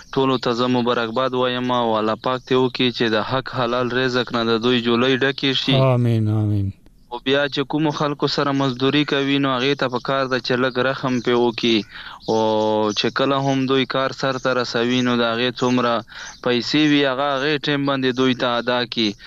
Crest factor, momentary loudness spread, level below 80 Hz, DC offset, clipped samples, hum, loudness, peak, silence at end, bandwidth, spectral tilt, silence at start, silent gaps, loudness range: 14 dB; 4 LU; -52 dBFS; under 0.1%; under 0.1%; none; -19 LUFS; -6 dBFS; 0 s; 7.8 kHz; -6 dB/octave; 0 s; none; 1 LU